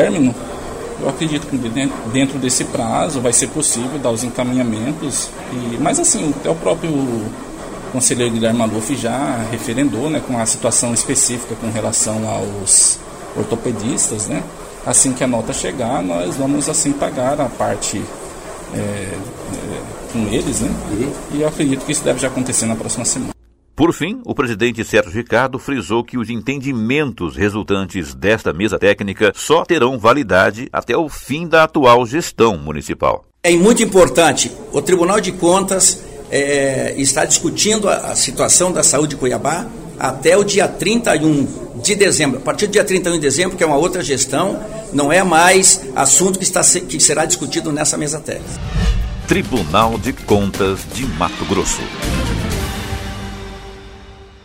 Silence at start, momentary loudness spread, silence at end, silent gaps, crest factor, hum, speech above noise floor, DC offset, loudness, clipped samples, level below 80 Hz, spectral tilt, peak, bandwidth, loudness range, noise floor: 0 s; 13 LU; 0.15 s; none; 16 dB; none; 22 dB; under 0.1%; -15 LUFS; under 0.1%; -34 dBFS; -3.5 dB/octave; 0 dBFS; 16.5 kHz; 6 LU; -38 dBFS